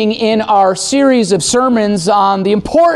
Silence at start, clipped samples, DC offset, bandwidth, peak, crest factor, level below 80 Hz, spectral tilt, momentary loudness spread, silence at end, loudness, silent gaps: 0 s; under 0.1%; under 0.1%; 12.5 kHz; -2 dBFS; 10 dB; -42 dBFS; -4 dB/octave; 2 LU; 0 s; -11 LUFS; none